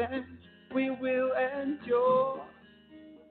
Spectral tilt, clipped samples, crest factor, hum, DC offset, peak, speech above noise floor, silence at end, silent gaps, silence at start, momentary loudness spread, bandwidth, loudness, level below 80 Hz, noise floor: -4 dB/octave; under 0.1%; 14 dB; none; under 0.1%; -16 dBFS; 26 dB; 0.15 s; none; 0 s; 15 LU; 4.4 kHz; -30 LUFS; -68 dBFS; -55 dBFS